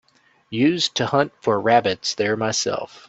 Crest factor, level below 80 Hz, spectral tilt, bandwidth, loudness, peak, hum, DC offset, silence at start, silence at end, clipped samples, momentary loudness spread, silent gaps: 20 dB; -62 dBFS; -4 dB/octave; 8.4 kHz; -20 LUFS; -2 dBFS; none; under 0.1%; 0.5 s; 0.1 s; under 0.1%; 6 LU; none